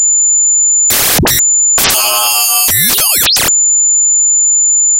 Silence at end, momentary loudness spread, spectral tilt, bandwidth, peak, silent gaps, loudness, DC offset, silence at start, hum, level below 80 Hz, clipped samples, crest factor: 0 s; 2 LU; 0 dB/octave; 17.5 kHz; 0 dBFS; none; -6 LUFS; under 0.1%; 0 s; none; -36 dBFS; under 0.1%; 10 dB